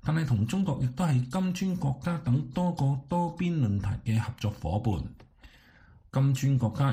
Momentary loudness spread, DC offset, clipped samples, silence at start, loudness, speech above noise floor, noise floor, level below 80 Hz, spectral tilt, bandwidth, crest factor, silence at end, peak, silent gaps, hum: 5 LU; under 0.1%; under 0.1%; 0.05 s; -29 LUFS; 29 dB; -56 dBFS; -48 dBFS; -7.5 dB/octave; 15 kHz; 14 dB; 0 s; -14 dBFS; none; none